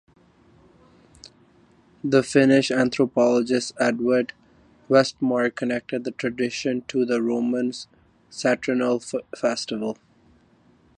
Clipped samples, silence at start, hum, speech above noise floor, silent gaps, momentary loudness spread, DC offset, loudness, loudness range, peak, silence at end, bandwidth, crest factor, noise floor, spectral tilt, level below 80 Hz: under 0.1%; 2.05 s; none; 36 dB; none; 11 LU; under 0.1%; -23 LUFS; 5 LU; -4 dBFS; 1.05 s; 10.5 kHz; 20 dB; -58 dBFS; -5 dB/octave; -64 dBFS